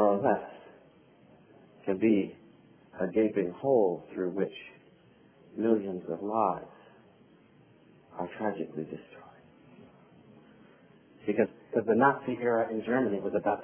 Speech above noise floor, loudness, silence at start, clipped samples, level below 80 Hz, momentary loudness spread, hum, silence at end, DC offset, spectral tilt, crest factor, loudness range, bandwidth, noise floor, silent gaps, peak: 31 dB; -30 LUFS; 0 s; under 0.1%; -70 dBFS; 20 LU; none; 0 s; under 0.1%; -6 dB/octave; 22 dB; 11 LU; 3.5 kHz; -60 dBFS; none; -8 dBFS